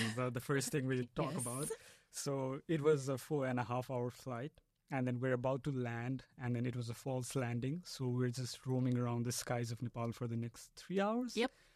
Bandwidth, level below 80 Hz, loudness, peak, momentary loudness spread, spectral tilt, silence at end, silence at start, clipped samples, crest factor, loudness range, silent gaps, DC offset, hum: 15 kHz; -70 dBFS; -39 LUFS; -20 dBFS; 8 LU; -5.5 dB/octave; 0.25 s; 0 s; under 0.1%; 20 dB; 2 LU; none; under 0.1%; none